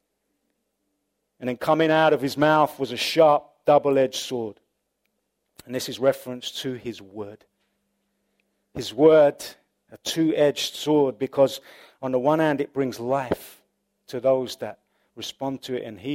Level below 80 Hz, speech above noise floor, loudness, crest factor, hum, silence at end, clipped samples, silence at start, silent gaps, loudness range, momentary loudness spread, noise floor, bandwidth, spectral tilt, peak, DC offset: -64 dBFS; 54 dB; -22 LUFS; 20 dB; 50 Hz at -60 dBFS; 0 s; under 0.1%; 1.4 s; none; 10 LU; 17 LU; -76 dBFS; 16 kHz; -5 dB/octave; -4 dBFS; under 0.1%